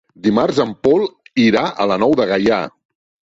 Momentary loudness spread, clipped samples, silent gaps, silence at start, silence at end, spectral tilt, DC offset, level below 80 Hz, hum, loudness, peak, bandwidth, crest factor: 4 LU; under 0.1%; none; 0.25 s; 0.6 s; -6 dB/octave; under 0.1%; -52 dBFS; none; -16 LUFS; -2 dBFS; 7.8 kHz; 14 dB